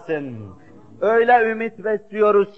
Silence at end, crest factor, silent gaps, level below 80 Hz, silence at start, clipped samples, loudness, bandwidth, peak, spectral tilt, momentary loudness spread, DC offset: 0.05 s; 16 dB; none; -64 dBFS; 0.05 s; under 0.1%; -19 LUFS; 5.8 kHz; -4 dBFS; -7.5 dB/octave; 14 LU; 0.4%